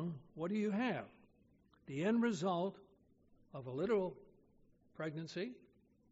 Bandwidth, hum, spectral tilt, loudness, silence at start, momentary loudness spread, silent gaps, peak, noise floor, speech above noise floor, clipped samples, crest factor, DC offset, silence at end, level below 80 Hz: 7.6 kHz; none; -6 dB/octave; -40 LUFS; 0 s; 16 LU; none; -24 dBFS; -71 dBFS; 33 dB; under 0.1%; 16 dB; under 0.1%; 0.55 s; -76 dBFS